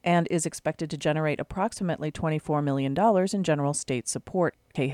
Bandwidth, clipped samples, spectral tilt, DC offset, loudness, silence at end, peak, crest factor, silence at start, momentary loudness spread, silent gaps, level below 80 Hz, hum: 14.5 kHz; under 0.1%; -5.5 dB/octave; under 0.1%; -27 LUFS; 0 s; -10 dBFS; 16 dB; 0.05 s; 7 LU; none; -56 dBFS; none